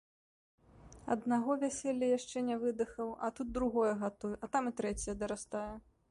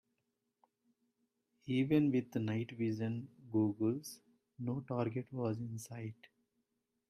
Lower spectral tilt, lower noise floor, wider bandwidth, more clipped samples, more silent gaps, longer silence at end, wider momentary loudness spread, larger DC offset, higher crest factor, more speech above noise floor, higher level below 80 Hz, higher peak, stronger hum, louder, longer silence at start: second, -5 dB/octave vs -7.5 dB/octave; second, -56 dBFS vs -85 dBFS; second, 11.5 kHz vs 14.5 kHz; neither; neither; second, 0.3 s vs 0.85 s; second, 9 LU vs 15 LU; neither; about the same, 16 dB vs 20 dB; second, 21 dB vs 49 dB; first, -58 dBFS vs -76 dBFS; about the same, -20 dBFS vs -20 dBFS; neither; about the same, -36 LUFS vs -38 LUFS; second, 0.75 s vs 1.65 s